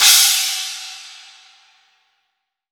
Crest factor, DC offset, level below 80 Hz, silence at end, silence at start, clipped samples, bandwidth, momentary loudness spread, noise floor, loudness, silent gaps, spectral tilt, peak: 20 dB; under 0.1%; -86 dBFS; 1.6 s; 0 s; under 0.1%; over 20 kHz; 25 LU; -74 dBFS; -13 LUFS; none; 6 dB/octave; 0 dBFS